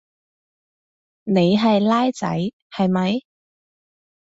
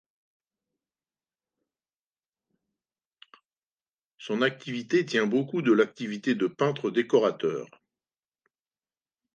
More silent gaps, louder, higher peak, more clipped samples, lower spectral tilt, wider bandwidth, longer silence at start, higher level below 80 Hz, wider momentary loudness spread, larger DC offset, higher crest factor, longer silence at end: first, 2.53-2.70 s vs none; first, -20 LUFS vs -26 LUFS; about the same, -6 dBFS vs -8 dBFS; neither; about the same, -7 dB/octave vs -6 dB/octave; about the same, 8 kHz vs 8.8 kHz; second, 1.25 s vs 4.2 s; first, -62 dBFS vs -80 dBFS; about the same, 11 LU vs 9 LU; neither; second, 16 dB vs 22 dB; second, 1.15 s vs 1.7 s